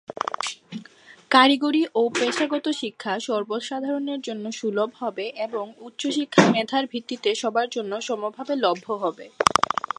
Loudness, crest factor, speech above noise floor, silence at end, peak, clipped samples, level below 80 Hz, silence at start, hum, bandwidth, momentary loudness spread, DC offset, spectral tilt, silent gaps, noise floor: -24 LUFS; 24 dB; 26 dB; 0.35 s; 0 dBFS; under 0.1%; -62 dBFS; 0.2 s; none; 11.5 kHz; 12 LU; under 0.1%; -4 dB/octave; none; -49 dBFS